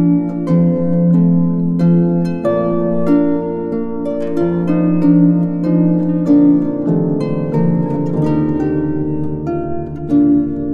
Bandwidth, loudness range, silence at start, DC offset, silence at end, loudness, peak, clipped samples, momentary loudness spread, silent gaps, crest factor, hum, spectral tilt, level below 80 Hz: 4.4 kHz; 3 LU; 0 s; under 0.1%; 0 s; -15 LUFS; 0 dBFS; under 0.1%; 9 LU; none; 12 dB; none; -11 dB/octave; -42 dBFS